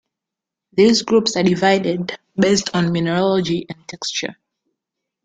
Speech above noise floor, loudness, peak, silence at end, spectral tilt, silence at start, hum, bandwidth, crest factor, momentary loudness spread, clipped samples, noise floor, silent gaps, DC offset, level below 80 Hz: 67 dB; -18 LUFS; -2 dBFS; 0.9 s; -5 dB/octave; 0.75 s; none; 9.4 kHz; 18 dB; 11 LU; under 0.1%; -85 dBFS; none; under 0.1%; -56 dBFS